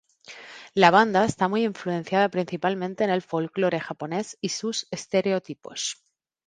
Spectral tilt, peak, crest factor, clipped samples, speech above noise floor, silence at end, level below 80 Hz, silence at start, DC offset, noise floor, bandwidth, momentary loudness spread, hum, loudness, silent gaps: -4.5 dB/octave; 0 dBFS; 24 dB; under 0.1%; 22 dB; 0.55 s; -64 dBFS; 0.3 s; under 0.1%; -46 dBFS; 9.8 kHz; 13 LU; none; -24 LUFS; none